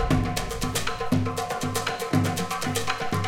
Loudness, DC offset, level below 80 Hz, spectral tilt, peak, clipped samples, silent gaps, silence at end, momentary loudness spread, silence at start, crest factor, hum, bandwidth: -27 LUFS; under 0.1%; -38 dBFS; -4.5 dB/octave; -8 dBFS; under 0.1%; none; 0 s; 4 LU; 0 s; 18 dB; none; 17 kHz